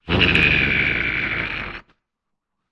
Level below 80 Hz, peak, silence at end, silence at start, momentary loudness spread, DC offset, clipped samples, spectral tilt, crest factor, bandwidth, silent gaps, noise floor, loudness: -36 dBFS; -2 dBFS; 0.9 s; 0.05 s; 16 LU; under 0.1%; under 0.1%; -5.5 dB/octave; 18 dB; 11 kHz; none; -79 dBFS; -17 LUFS